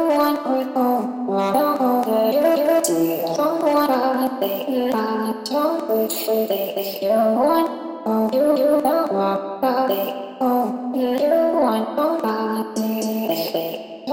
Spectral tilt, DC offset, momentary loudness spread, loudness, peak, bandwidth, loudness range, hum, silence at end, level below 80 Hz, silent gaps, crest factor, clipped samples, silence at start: -4.5 dB/octave; under 0.1%; 6 LU; -20 LUFS; -4 dBFS; 17 kHz; 2 LU; none; 0 s; -68 dBFS; none; 14 dB; under 0.1%; 0 s